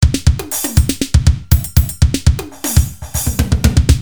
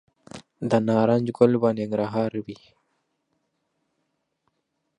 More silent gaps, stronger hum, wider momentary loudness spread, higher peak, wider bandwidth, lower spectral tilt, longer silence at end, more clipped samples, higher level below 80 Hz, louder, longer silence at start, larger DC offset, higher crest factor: neither; neither; second, 5 LU vs 13 LU; first, 0 dBFS vs -4 dBFS; first, over 20 kHz vs 10.5 kHz; second, -5 dB/octave vs -8 dB/octave; second, 0 s vs 2.45 s; first, 0.4% vs under 0.1%; first, -16 dBFS vs -66 dBFS; first, -15 LUFS vs -23 LUFS; second, 0 s vs 0.35 s; first, 1% vs under 0.1%; second, 14 dB vs 22 dB